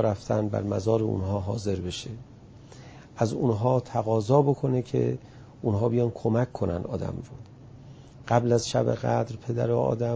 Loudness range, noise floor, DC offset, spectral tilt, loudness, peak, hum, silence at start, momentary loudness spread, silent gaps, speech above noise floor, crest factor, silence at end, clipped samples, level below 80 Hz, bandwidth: 4 LU; -47 dBFS; under 0.1%; -7 dB/octave; -27 LUFS; -6 dBFS; none; 0 s; 18 LU; none; 22 dB; 20 dB; 0 s; under 0.1%; -48 dBFS; 8 kHz